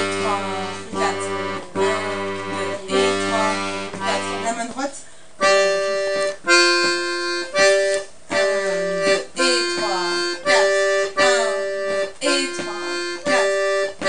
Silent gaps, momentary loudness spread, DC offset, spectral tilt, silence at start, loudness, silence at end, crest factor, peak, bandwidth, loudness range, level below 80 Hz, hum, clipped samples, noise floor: none; 10 LU; 1%; -2.5 dB/octave; 0 s; -20 LUFS; 0 s; 18 dB; -2 dBFS; 10.5 kHz; 5 LU; -60 dBFS; none; under 0.1%; -41 dBFS